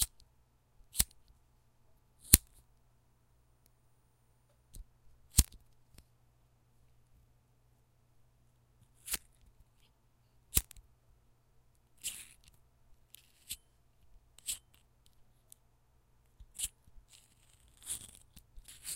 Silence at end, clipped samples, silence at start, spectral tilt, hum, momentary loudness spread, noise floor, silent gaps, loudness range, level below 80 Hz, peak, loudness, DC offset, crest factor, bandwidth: 0 s; under 0.1%; 0 s; -1.5 dB/octave; none; 27 LU; -70 dBFS; none; 15 LU; -50 dBFS; 0 dBFS; -34 LUFS; under 0.1%; 42 dB; 16 kHz